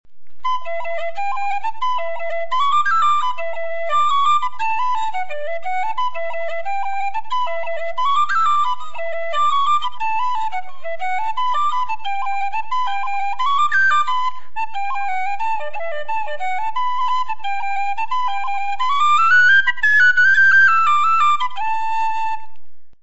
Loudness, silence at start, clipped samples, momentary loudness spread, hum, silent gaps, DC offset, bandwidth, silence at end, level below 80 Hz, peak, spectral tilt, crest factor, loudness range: -18 LUFS; 0 s; under 0.1%; 13 LU; none; none; 10%; 8 kHz; 0 s; -56 dBFS; -4 dBFS; -0.5 dB/octave; 14 dB; 10 LU